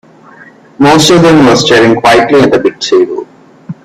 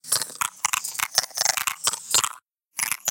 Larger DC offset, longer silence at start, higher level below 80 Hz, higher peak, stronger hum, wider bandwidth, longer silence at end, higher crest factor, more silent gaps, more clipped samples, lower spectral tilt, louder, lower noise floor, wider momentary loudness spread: neither; first, 0.8 s vs 0.05 s; first, -40 dBFS vs -66 dBFS; about the same, 0 dBFS vs -2 dBFS; neither; second, 15 kHz vs 17 kHz; about the same, 0.1 s vs 0 s; second, 8 dB vs 26 dB; neither; first, 0.4% vs under 0.1%; first, -4.5 dB/octave vs 2 dB/octave; first, -6 LUFS vs -23 LUFS; second, -36 dBFS vs -46 dBFS; about the same, 8 LU vs 7 LU